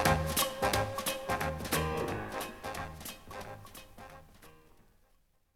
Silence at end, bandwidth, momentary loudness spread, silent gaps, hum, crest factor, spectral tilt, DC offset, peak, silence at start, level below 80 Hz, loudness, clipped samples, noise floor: 1 s; over 20 kHz; 21 LU; none; none; 24 dB; -3.5 dB/octave; under 0.1%; -12 dBFS; 0 s; -50 dBFS; -34 LUFS; under 0.1%; -69 dBFS